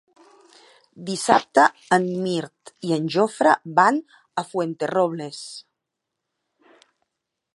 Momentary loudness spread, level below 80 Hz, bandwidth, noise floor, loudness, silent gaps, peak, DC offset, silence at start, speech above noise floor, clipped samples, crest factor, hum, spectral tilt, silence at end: 16 LU; -74 dBFS; 11.5 kHz; -82 dBFS; -21 LUFS; none; 0 dBFS; under 0.1%; 1 s; 61 dB; under 0.1%; 22 dB; none; -4.5 dB/octave; 1.95 s